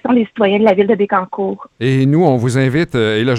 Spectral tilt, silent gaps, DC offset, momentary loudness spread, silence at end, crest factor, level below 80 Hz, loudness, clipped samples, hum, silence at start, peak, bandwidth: -7 dB/octave; none; under 0.1%; 8 LU; 0 s; 14 dB; -50 dBFS; -14 LUFS; under 0.1%; none; 0.05 s; 0 dBFS; 11.5 kHz